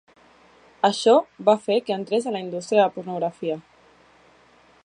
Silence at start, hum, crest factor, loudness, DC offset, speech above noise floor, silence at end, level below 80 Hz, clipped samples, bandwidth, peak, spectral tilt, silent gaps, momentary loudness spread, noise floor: 0.85 s; none; 20 dB; -22 LUFS; under 0.1%; 34 dB; 1.25 s; -74 dBFS; under 0.1%; 10.5 kHz; -4 dBFS; -4.5 dB/octave; none; 11 LU; -55 dBFS